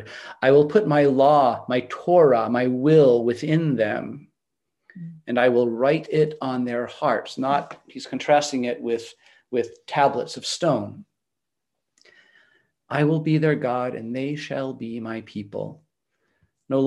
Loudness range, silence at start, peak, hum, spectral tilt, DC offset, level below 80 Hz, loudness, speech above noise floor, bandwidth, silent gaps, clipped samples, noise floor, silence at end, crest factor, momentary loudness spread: 8 LU; 0 s; -4 dBFS; none; -6.5 dB/octave; under 0.1%; -70 dBFS; -22 LUFS; 64 dB; 11.5 kHz; none; under 0.1%; -85 dBFS; 0 s; 18 dB; 17 LU